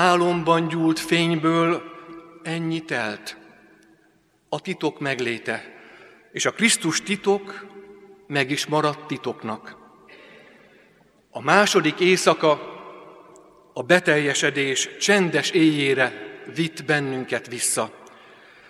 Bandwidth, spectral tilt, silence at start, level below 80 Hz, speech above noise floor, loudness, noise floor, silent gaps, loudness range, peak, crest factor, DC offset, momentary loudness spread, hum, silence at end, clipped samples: 14.5 kHz; -3.5 dB/octave; 0 s; -70 dBFS; 39 dB; -22 LUFS; -61 dBFS; none; 8 LU; 0 dBFS; 24 dB; under 0.1%; 18 LU; none; 0.6 s; under 0.1%